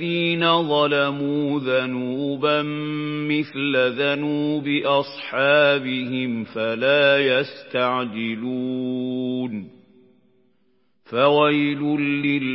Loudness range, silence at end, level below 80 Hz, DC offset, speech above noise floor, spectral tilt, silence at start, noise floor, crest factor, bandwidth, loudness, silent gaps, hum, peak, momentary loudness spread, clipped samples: 6 LU; 0 s; -72 dBFS; under 0.1%; 46 dB; -10.5 dB/octave; 0 s; -67 dBFS; 18 dB; 5.8 kHz; -21 LUFS; none; none; -4 dBFS; 10 LU; under 0.1%